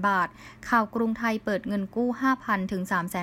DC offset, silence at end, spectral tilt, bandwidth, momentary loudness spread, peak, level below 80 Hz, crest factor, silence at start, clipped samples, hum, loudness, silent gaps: under 0.1%; 0 s; -6 dB/octave; 16 kHz; 4 LU; -8 dBFS; -58 dBFS; 18 dB; 0 s; under 0.1%; none; -27 LUFS; none